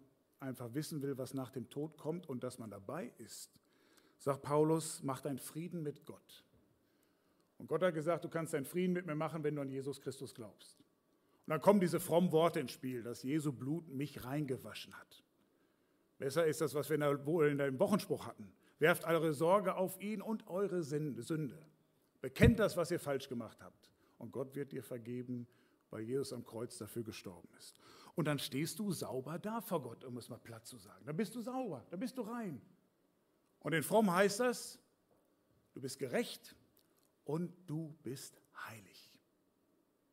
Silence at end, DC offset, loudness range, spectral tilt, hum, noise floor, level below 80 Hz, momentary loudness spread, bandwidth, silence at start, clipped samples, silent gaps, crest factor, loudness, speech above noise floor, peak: 1.1 s; under 0.1%; 10 LU; -5.5 dB/octave; none; -77 dBFS; -60 dBFS; 19 LU; 16 kHz; 0.4 s; under 0.1%; none; 24 dB; -38 LUFS; 39 dB; -14 dBFS